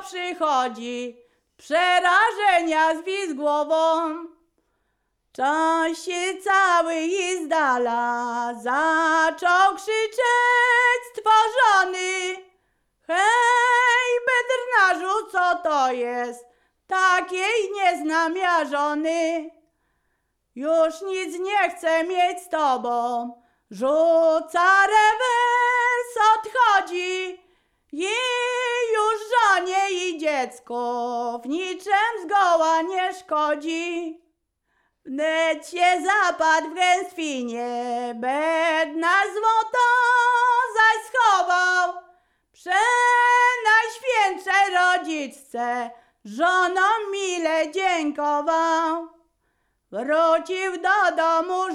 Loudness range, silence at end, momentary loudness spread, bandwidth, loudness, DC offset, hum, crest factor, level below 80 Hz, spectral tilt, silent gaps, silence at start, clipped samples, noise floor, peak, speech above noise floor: 5 LU; 0 s; 11 LU; 14 kHz; -21 LUFS; under 0.1%; none; 16 dB; -68 dBFS; -1 dB/octave; none; 0 s; under 0.1%; -73 dBFS; -6 dBFS; 52 dB